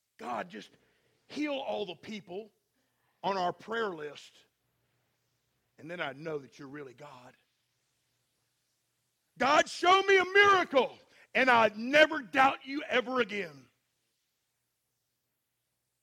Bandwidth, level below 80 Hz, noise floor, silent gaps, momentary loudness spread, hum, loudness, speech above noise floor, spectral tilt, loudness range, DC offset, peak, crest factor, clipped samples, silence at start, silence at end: 15.5 kHz; -74 dBFS; -83 dBFS; none; 22 LU; none; -28 LUFS; 53 dB; -3 dB/octave; 19 LU; under 0.1%; -8 dBFS; 24 dB; under 0.1%; 0.2 s; 2.45 s